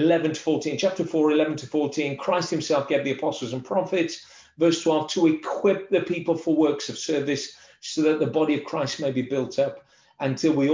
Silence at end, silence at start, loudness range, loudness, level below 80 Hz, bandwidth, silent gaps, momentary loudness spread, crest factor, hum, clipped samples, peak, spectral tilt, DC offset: 0 s; 0 s; 2 LU; -24 LUFS; -68 dBFS; 7.6 kHz; none; 7 LU; 14 dB; none; under 0.1%; -8 dBFS; -5 dB/octave; under 0.1%